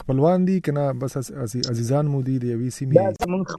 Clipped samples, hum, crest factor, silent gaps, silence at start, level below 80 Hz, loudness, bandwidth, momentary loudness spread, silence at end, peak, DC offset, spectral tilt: under 0.1%; none; 20 dB; none; 0 s; -50 dBFS; -22 LUFS; 13.5 kHz; 9 LU; 0 s; -2 dBFS; under 0.1%; -7 dB/octave